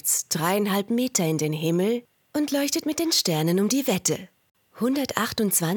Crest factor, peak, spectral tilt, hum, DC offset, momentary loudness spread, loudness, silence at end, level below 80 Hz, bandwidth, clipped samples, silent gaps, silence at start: 20 dB; -4 dBFS; -4 dB/octave; none; under 0.1%; 5 LU; -24 LUFS; 0 s; -64 dBFS; 19 kHz; under 0.1%; none; 0.05 s